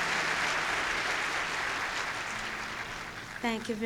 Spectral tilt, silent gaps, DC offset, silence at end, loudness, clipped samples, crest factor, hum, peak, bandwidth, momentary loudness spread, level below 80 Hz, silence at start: -2 dB/octave; none; under 0.1%; 0 s; -31 LUFS; under 0.1%; 16 dB; none; -16 dBFS; over 20 kHz; 8 LU; -56 dBFS; 0 s